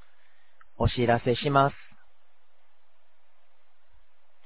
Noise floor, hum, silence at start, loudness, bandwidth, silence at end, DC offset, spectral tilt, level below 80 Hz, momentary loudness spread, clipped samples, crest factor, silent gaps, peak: -70 dBFS; none; 0.8 s; -25 LUFS; 4 kHz; 2.7 s; 0.8%; -5 dB/octave; -46 dBFS; 5 LU; under 0.1%; 22 dB; none; -8 dBFS